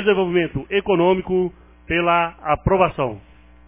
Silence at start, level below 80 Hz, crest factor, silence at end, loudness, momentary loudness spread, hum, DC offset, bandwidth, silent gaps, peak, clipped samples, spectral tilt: 0 s; -40 dBFS; 18 dB; 0.45 s; -20 LUFS; 9 LU; none; under 0.1%; 3.8 kHz; none; -2 dBFS; under 0.1%; -10.5 dB/octave